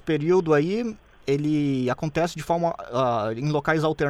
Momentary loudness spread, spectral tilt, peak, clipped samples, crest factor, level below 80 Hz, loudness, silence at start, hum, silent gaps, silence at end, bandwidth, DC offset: 6 LU; -7 dB/octave; -8 dBFS; under 0.1%; 16 dB; -52 dBFS; -24 LUFS; 0.05 s; none; none; 0 s; 13.5 kHz; under 0.1%